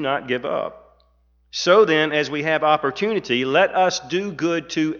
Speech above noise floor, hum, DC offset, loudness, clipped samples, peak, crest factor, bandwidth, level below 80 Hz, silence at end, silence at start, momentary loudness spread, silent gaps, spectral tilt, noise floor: 40 dB; 60 Hz at -55 dBFS; under 0.1%; -20 LUFS; under 0.1%; -4 dBFS; 18 dB; 7.4 kHz; -60 dBFS; 0 s; 0 s; 10 LU; none; -4 dB/octave; -60 dBFS